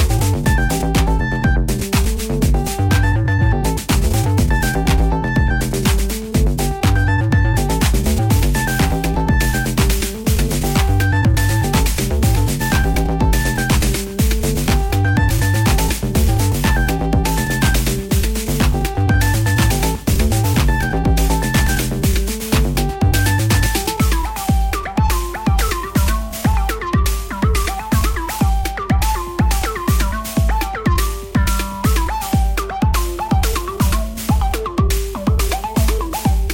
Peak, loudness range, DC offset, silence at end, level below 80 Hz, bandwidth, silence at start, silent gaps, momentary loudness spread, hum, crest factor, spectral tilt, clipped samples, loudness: -4 dBFS; 2 LU; under 0.1%; 0 s; -20 dBFS; 17 kHz; 0 s; none; 4 LU; none; 12 dB; -5 dB/octave; under 0.1%; -17 LUFS